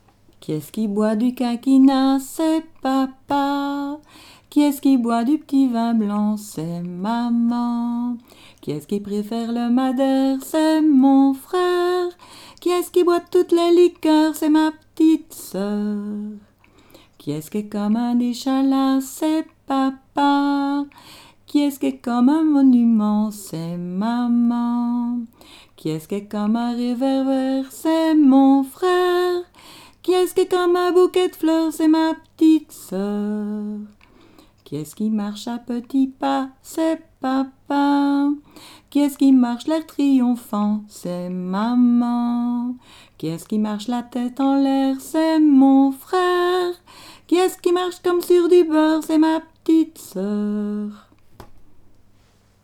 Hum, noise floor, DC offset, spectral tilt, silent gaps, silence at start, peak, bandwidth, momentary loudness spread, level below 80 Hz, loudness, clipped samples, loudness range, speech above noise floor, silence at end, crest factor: none; -55 dBFS; under 0.1%; -6 dB/octave; none; 0.5 s; -4 dBFS; 16 kHz; 13 LU; -60 dBFS; -19 LUFS; under 0.1%; 5 LU; 37 dB; 0.9 s; 14 dB